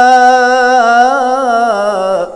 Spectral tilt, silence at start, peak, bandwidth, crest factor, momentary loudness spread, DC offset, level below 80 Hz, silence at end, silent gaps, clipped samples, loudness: -3 dB/octave; 0 s; 0 dBFS; 11 kHz; 8 dB; 7 LU; under 0.1%; -52 dBFS; 0 s; none; 0.8%; -9 LUFS